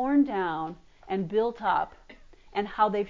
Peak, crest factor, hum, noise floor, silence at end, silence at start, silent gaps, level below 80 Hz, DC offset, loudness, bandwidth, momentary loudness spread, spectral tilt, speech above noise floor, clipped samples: -10 dBFS; 18 dB; none; -51 dBFS; 0 s; 0 s; none; -58 dBFS; under 0.1%; -29 LUFS; 7.2 kHz; 12 LU; -8 dB/octave; 24 dB; under 0.1%